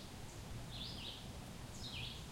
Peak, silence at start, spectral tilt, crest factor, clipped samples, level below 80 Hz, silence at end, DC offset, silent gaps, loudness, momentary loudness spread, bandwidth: -34 dBFS; 0 s; -4 dB/octave; 16 dB; under 0.1%; -56 dBFS; 0 s; under 0.1%; none; -48 LUFS; 5 LU; 16.5 kHz